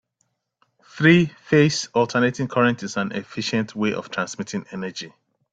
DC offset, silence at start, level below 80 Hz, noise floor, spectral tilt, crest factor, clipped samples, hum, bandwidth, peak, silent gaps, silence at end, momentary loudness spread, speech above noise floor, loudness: under 0.1%; 0.95 s; -60 dBFS; -72 dBFS; -5.5 dB/octave; 20 dB; under 0.1%; none; 9.2 kHz; -2 dBFS; none; 0.45 s; 14 LU; 51 dB; -21 LUFS